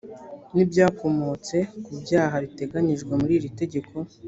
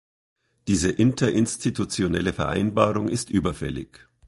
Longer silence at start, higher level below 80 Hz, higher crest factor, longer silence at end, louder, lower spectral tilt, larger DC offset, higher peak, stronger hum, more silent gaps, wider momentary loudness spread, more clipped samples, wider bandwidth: second, 0.05 s vs 0.65 s; second, -56 dBFS vs -44 dBFS; about the same, 18 dB vs 22 dB; second, 0 s vs 0.45 s; about the same, -24 LUFS vs -24 LUFS; first, -7 dB/octave vs -5.5 dB/octave; neither; about the same, -6 dBFS vs -4 dBFS; neither; neither; about the same, 12 LU vs 11 LU; neither; second, 8 kHz vs 11.5 kHz